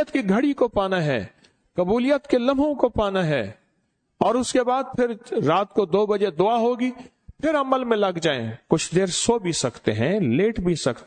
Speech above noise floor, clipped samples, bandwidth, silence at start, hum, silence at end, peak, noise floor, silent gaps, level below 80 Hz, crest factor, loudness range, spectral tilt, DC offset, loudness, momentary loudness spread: 49 dB; under 0.1%; 9.4 kHz; 0 s; none; 0 s; -4 dBFS; -71 dBFS; none; -48 dBFS; 18 dB; 1 LU; -5 dB/octave; under 0.1%; -22 LUFS; 6 LU